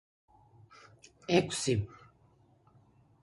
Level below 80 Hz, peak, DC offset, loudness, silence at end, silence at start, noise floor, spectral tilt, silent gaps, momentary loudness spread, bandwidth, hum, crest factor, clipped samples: -60 dBFS; -10 dBFS; under 0.1%; -31 LUFS; 1.25 s; 1.3 s; -65 dBFS; -4.5 dB/octave; none; 20 LU; 11.5 kHz; none; 26 dB; under 0.1%